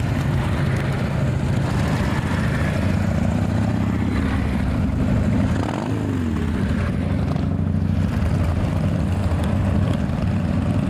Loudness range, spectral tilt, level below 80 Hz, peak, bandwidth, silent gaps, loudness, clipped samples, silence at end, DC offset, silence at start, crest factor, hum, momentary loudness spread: 1 LU; -7.5 dB/octave; -30 dBFS; -8 dBFS; 13 kHz; none; -21 LUFS; under 0.1%; 0 s; under 0.1%; 0 s; 12 dB; none; 2 LU